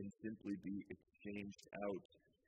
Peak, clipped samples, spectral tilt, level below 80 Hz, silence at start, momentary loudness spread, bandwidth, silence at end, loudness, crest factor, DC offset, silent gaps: -32 dBFS; under 0.1%; -7 dB/octave; -78 dBFS; 0 s; 6 LU; 10 kHz; 0.3 s; -50 LUFS; 18 dB; under 0.1%; 2.05-2.09 s